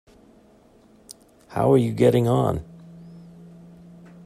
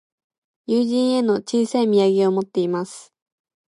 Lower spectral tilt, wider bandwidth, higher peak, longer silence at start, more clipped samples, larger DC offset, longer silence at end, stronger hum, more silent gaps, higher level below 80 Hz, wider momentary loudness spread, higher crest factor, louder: first, -8 dB/octave vs -6 dB/octave; first, 14.5 kHz vs 11.5 kHz; first, -4 dBFS vs -8 dBFS; first, 1.1 s vs 0.7 s; neither; neither; first, 1.05 s vs 0.65 s; neither; neither; first, -52 dBFS vs -72 dBFS; first, 26 LU vs 13 LU; first, 20 dB vs 14 dB; about the same, -21 LUFS vs -20 LUFS